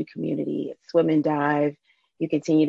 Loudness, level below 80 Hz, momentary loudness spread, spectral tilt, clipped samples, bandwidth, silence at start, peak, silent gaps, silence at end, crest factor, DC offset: -24 LUFS; -72 dBFS; 8 LU; -7.5 dB/octave; under 0.1%; 7.6 kHz; 0 s; -8 dBFS; none; 0 s; 16 dB; under 0.1%